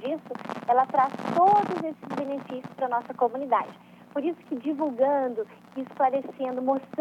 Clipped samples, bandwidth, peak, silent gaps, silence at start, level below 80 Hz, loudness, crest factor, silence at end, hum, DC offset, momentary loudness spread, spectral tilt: under 0.1%; 10.5 kHz; -10 dBFS; none; 0 s; -80 dBFS; -27 LUFS; 16 dB; 0 s; 60 Hz at -55 dBFS; under 0.1%; 13 LU; -7 dB/octave